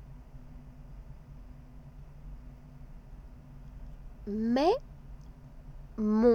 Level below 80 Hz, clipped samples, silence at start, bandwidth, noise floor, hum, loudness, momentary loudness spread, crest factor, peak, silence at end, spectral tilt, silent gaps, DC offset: -48 dBFS; under 0.1%; 0 s; 8.6 kHz; -49 dBFS; none; -30 LUFS; 25 LU; 22 dB; -12 dBFS; 0 s; -7.5 dB/octave; none; under 0.1%